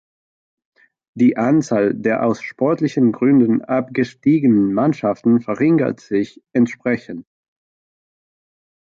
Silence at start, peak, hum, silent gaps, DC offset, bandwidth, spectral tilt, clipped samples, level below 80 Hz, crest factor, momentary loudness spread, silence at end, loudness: 1.15 s; -4 dBFS; none; none; under 0.1%; 7.4 kHz; -8 dB/octave; under 0.1%; -60 dBFS; 14 dB; 8 LU; 1.65 s; -17 LUFS